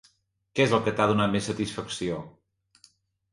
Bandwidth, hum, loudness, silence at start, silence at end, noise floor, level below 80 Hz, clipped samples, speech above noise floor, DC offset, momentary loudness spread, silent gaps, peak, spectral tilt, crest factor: 11.5 kHz; none; -26 LUFS; 0.55 s; 1.05 s; -67 dBFS; -58 dBFS; under 0.1%; 41 dB; under 0.1%; 11 LU; none; -6 dBFS; -5.5 dB/octave; 22 dB